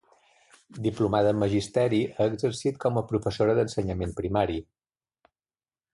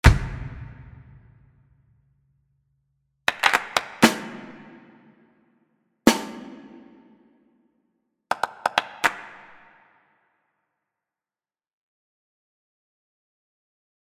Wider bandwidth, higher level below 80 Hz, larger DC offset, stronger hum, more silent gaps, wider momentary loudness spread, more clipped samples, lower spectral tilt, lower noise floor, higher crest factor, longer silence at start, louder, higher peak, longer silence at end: second, 11.5 kHz vs 16 kHz; second, -48 dBFS vs -36 dBFS; neither; neither; neither; second, 7 LU vs 25 LU; neither; first, -6.5 dB/octave vs -4.5 dB/octave; about the same, under -90 dBFS vs under -90 dBFS; second, 18 dB vs 28 dB; first, 0.75 s vs 0.05 s; second, -27 LUFS vs -23 LUFS; second, -10 dBFS vs 0 dBFS; second, 1.3 s vs 4.75 s